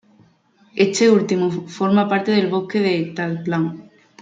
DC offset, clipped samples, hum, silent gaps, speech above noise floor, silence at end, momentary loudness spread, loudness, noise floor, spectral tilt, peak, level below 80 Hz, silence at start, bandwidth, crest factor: under 0.1%; under 0.1%; none; none; 38 dB; 0.4 s; 9 LU; -19 LUFS; -56 dBFS; -5.5 dB/octave; -4 dBFS; -66 dBFS; 0.75 s; 9.2 kHz; 16 dB